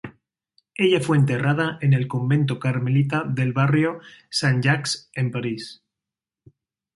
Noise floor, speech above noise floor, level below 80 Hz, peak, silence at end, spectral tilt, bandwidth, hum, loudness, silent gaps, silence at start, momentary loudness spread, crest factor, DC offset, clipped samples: -88 dBFS; 67 dB; -60 dBFS; -4 dBFS; 1.25 s; -6 dB/octave; 11.5 kHz; none; -22 LUFS; none; 0.05 s; 10 LU; 18 dB; under 0.1%; under 0.1%